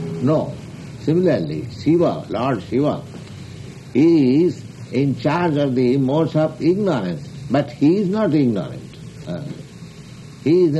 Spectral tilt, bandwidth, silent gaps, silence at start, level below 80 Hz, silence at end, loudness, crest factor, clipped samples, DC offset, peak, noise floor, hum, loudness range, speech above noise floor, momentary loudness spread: -8 dB/octave; 11.5 kHz; none; 0 s; -52 dBFS; 0 s; -19 LUFS; 14 dB; under 0.1%; under 0.1%; -6 dBFS; -38 dBFS; none; 3 LU; 20 dB; 19 LU